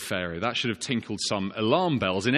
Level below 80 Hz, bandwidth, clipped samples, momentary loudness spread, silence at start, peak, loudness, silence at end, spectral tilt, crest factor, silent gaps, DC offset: -60 dBFS; 13.5 kHz; under 0.1%; 6 LU; 0 s; -8 dBFS; -27 LUFS; 0 s; -4.5 dB/octave; 20 dB; none; under 0.1%